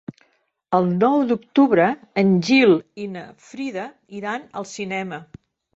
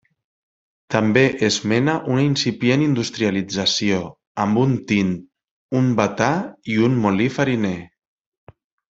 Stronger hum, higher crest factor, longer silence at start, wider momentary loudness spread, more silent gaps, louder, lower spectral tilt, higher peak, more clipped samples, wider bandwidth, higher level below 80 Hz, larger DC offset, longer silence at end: neither; about the same, 16 dB vs 18 dB; second, 0.1 s vs 0.9 s; first, 18 LU vs 7 LU; second, none vs 4.27-4.35 s, 5.51-5.69 s; about the same, -19 LUFS vs -19 LUFS; about the same, -6.5 dB/octave vs -5.5 dB/octave; about the same, -4 dBFS vs -2 dBFS; neither; about the same, 8 kHz vs 8 kHz; second, -62 dBFS vs -56 dBFS; neither; second, 0.5 s vs 1.05 s